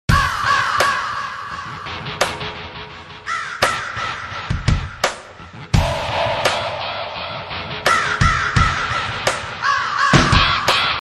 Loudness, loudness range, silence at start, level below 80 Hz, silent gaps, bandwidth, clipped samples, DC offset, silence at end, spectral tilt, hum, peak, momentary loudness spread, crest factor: -19 LUFS; 7 LU; 0.1 s; -30 dBFS; none; 13 kHz; under 0.1%; under 0.1%; 0 s; -4 dB/octave; none; 0 dBFS; 14 LU; 18 dB